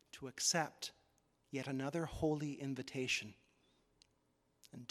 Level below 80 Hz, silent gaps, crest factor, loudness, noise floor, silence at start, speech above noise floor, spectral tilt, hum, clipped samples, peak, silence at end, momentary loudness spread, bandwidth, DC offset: -66 dBFS; none; 22 dB; -40 LUFS; -79 dBFS; 0.15 s; 38 dB; -3.5 dB/octave; none; under 0.1%; -22 dBFS; 0.05 s; 16 LU; 15.5 kHz; under 0.1%